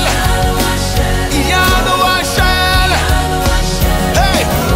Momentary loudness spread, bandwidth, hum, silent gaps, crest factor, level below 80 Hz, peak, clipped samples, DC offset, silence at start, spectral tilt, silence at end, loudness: 4 LU; 16.5 kHz; none; none; 12 dB; -18 dBFS; 0 dBFS; under 0.1%; under 0.1%; 0 s; -4 dB/octave; 0 s; -12 LUFS